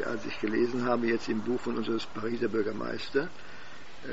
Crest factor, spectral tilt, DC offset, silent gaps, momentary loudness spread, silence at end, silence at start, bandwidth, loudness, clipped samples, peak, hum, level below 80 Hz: 18 dB; -4 dB/octave; 1%; none; 17 LU; 0 s; 0 s; 8 kHz; -31 LUFS; under 0.1%; -14 dBFS; none; -62 dBFS